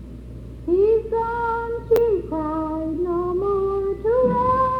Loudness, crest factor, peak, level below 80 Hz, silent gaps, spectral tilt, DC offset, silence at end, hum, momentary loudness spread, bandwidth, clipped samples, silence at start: -21 LUFS; 16 dB; -4 dBFS; -40 dBFS; none; -9 dB/octave; under 0.1%; 0 s; none; 8 LU; over 20 kHz; under 0.1%; 0 s